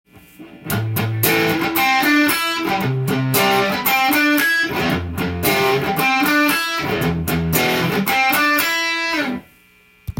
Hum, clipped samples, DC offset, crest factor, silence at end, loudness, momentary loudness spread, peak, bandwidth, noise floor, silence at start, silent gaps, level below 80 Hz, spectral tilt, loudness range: none; under 0.1%; under 0.1%; 18 dB; 0.1 s; -17 LUFS; 7 LU; 0 dBFS; 17 kHz; -52 dBFS; 0.4 s; none; -46 dBFS; -4 dB/octave; 2 LU